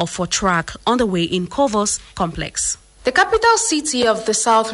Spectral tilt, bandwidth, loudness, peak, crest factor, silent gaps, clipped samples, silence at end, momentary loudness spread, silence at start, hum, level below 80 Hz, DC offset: -3 dB/octave; 11.5 kHz; -18 LUFS; -2 dBFS; 16 dB; none; under 0.1%; 0 s; 8 LU; 0 s; none; -42 dBFS; under 0.1%